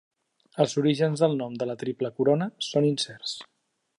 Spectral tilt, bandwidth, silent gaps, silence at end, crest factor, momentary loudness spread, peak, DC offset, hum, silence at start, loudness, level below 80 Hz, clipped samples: -5.5 dB/octave; 11.5 kHz; none; 0.55 s; 18 dB; 11 LU; -8 dBFS; under 0.1%; none; 0.55 s; -26 LUFS; -74 dBFS; under 0.1%